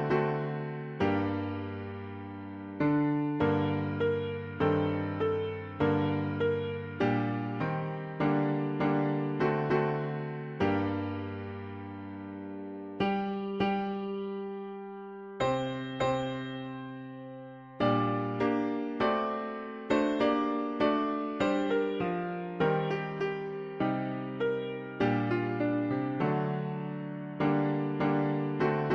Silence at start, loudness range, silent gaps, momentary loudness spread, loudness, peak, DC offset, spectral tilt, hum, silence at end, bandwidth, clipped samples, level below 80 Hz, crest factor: 0 s; 5 LU; none; 13 LU; -31 LUFS; -14 dBFS; under 0.1%; -8 dB/octave; none; 0 s; 7.4 kHz; under 0.1%; -62 dBFS; 16 dB